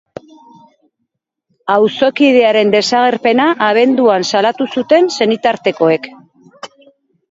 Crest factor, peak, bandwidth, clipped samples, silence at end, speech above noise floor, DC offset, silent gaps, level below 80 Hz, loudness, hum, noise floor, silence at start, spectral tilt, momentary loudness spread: 14 dB; 0 dBFS; 8 kHz; under 0.1%; 0.65 s; 60 dB; under 0.1%; none; -62 dBFS; -12 LUFS; none; -72 dBFS; 1.65 s; -4.5 dB/octave; 6 LU